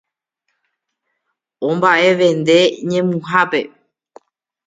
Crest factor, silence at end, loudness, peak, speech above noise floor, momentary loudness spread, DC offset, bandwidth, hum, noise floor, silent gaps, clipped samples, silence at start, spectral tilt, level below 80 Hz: 18 dB; 1 s; -15 LUFS; 0 dBFS; 59 dB; 9 LU; under 0.1%; 9.4 kHz; none; -74 dBFS; none; under 0.1%; 1.6 s; -5 dB/octave; -66 dBFS